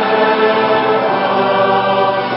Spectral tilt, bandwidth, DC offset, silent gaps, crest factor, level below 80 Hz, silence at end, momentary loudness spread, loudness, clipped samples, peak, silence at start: -10.5 dB/octave; 5.8 kHz; under 0.1%; none; 12 dB; -56 dBFS; 0 s; 2 LU; -13 LUFS; under 0.1%; 0 dBFS; 0 s